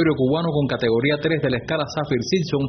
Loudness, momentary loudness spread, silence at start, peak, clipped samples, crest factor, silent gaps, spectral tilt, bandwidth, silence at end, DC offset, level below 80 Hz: -21 LUFS; 4 LU; 0 s; -6 dBFS; under 0.1%; 14 dB; none; -5.5 dB/octave; 6.4 kHz; 0 s; under 0.1%; -48 dBFS